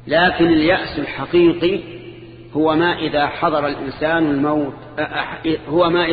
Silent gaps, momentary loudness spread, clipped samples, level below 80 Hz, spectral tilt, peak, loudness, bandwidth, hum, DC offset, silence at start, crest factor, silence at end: none; 11 LU; under 0.1%; -44 dBFS; -8.5 dB/octave; -4 dBFS; -18 LUFS; 5 kHz; none; under 0.1%; 0.05 s; 14 dB; 0 s